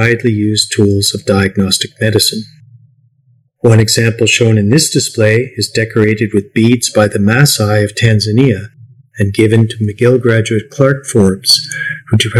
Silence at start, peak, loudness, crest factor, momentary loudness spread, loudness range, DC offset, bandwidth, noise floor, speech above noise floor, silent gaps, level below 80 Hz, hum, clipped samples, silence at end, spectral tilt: 0 s; 0 dBFS; -11 LUFS; 12 dB; 6 LU; 2 LU; under 0.1%; 14 kHz; -53 dBFS; 42 dB; none; -46 dBFS; none; 1%; 0 s; -4.5 dB/octave